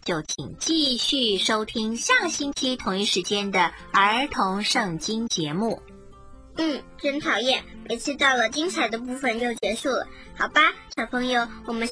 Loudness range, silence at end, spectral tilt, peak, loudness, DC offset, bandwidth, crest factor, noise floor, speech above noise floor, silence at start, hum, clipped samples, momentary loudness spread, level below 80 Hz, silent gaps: 4 LU; 0 s; -2.5 dB/octave; -6 dBFS; -23 LUFS; under 0.1%; 10.5 kHz; 20 dB; -45 dBFS; 21 dB; 0.05 s; none; under 0.1%; 9 LU; -52 dBFS; none